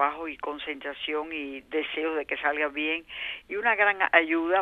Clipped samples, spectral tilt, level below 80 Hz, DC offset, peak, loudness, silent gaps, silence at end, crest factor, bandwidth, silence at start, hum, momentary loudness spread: under 0.1%; -4.5 dB/octave; -64 dBFS; under 0.1%; -4 dBFS; -27 LUFS; none; 0 s; 24 dB; 4.8 kHz; 0 s; none; 12 LU